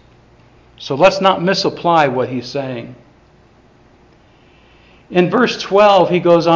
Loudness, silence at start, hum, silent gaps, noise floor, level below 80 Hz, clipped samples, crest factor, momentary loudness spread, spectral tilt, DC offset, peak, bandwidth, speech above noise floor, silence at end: -14 LUFS; 0.8 s; none; none; -48 dBFS; -52 dBFS; under 0.1%; 16 dB; 15 LU; -5.5 dB/octave; under 0.1%; 0 dBFS; 7.6 kHz; 35 dB; 0 s